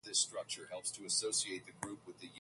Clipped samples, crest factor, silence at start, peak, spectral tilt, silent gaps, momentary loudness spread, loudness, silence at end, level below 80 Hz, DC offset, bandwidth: under 0.1%; 20 dB; 0.05 s; -20 dBFS; -0.5 dB/octave; none; 13 LU; -38 LUFS; 0 s; -78 dBFS; under 0.1%; 12 kHz